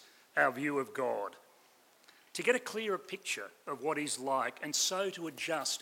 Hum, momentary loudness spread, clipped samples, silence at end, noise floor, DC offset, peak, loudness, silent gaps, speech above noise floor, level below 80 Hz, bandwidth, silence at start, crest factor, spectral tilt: none; 8 LU; under 0.1%; 0 s; -65 dBFS; under 0.1%; -14 dBFS; -34 LUFS; none; 30 dB; -90 dBFS; 16.5 kHz; 0 s; 22 dB; -2 dB/octave